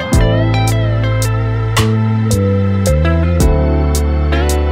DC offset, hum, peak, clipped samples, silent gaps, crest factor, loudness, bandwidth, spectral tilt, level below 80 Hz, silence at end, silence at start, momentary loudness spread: under 0.1%; none; -2 dBFS; under 0.1%; none; 10 dB; -14 LUFS; 16.5 kHz; -6 dB/octave; -18 dBFS; 0 s; 0 s; 2 LU